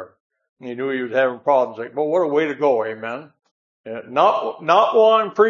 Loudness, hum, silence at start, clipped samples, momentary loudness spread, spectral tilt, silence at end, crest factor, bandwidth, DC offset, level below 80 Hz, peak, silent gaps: -19 LUFS; none; 0 s; under 0.1%; 18 LU; -5.5 dB/octave; 0 s; 18 dB; 7.2 kHz; under 0.1%; -80 dBFS; -2 dBFS; 0.20-0.30 s, 0.49-0.56 s, 3.51-3.84 s